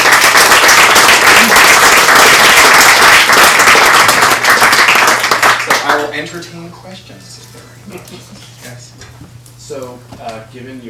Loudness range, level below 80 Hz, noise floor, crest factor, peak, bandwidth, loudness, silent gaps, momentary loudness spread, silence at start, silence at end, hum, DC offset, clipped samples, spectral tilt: 12 LU; -42 dBFS; -35 dBFS; 8 dB; 0 dBFS; 16 kHz; -5 LUFS; none; 19 LU; 0 s; 0 s; none; under 0.1%; 1%; -0.5 dB/octave